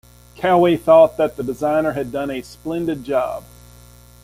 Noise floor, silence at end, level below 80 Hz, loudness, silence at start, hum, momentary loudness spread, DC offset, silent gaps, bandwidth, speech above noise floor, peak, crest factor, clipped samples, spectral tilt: -45 dBFS; 0.8 s; -48 dBFS; -18 LUFS; 0.4 s; 60 Hz at -45 dBFS; 15 LU; under 0.1%; none; 16 kHz; 27 dB; -2 dBFS; 16 dB; under 0.1%; -6.5 dB/octave